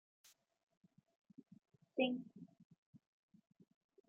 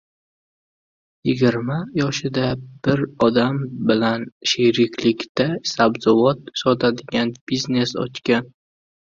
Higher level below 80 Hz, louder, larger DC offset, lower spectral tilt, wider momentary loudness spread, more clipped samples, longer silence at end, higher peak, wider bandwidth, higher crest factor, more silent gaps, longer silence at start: second, under -90 dBFS vs -54 dBFS; second, -41 LUFS vs -20 LUFS; neither; second, -3 dB/octave vs -5.5 dB/octave; first, 25 LU vs 7 LU; neither; first, 1.1 s vs 0.55 s; second, -24 dBFS vs -2 dBFS; about the same, 7.2 kHz vs 7.6 kHz; first, 26 dB vs 18 dB; about the same, 2.65-2.70 s, 2.78-2.93 s vs 4.32-4.41 s, 5.29-5.35 s, 7.41-7.47 s; first, 1.95 s vs 1.25 s